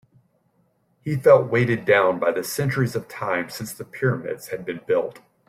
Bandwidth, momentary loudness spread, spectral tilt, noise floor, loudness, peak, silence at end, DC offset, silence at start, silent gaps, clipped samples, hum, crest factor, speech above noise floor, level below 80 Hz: 16 kHz; 15 LU; -6 dB/octave; -66 dBFS; -22 LUFS; -4 dBFS; 0.3 s; under 0.1%; 1.05 s; none; under 0.1%; none; 20 dB; 44 dB; -60 dBFS